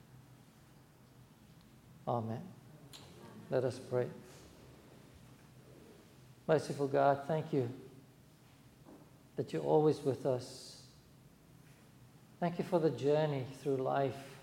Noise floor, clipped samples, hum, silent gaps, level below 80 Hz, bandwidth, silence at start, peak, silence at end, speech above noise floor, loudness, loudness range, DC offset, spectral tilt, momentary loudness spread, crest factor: -62 dBFS; under 0.1%; none; none; -74 dBFS; 16.5 kHz; 1.9 s; -16 dBFS; 0 s; 27 dB; -35 LUFS; 6 LU; under 0.1%; -7 dB/octave; 26 LU; 22 dB